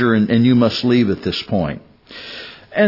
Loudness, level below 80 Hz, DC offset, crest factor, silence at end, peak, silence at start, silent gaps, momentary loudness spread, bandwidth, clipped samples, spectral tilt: -16 LUFS; -50 dBFS; under 0.1%; 14 dB; 0 s; -2 dBFS; 0 s; none; 19 LU; 5.8 kHz; under 0.1%; -7.5 dB/octave